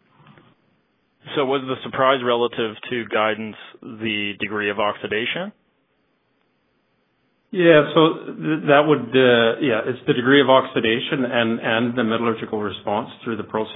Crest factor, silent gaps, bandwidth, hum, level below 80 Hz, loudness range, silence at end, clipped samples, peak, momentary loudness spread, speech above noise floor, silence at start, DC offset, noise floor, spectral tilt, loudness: 20 dB; none; 4 kHz; none; -64 dBFS; 9 LU; 0 s; under 0.1%; 0 dBFS; 13 LU; 47 dB; 1.25 s; under 0.1%; -67 dBFS; -9 dB/octave; -20 LUFS